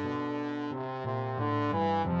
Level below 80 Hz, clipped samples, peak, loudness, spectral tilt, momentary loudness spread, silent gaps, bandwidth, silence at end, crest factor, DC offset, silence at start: -60 dBFS; under 0.1%; -18 dBFS; -32 LUFS; -8.5 dB/octave; 6 LU; none; 7.4 kHz; 0 s; 14 dB; under 0.1%; 0 s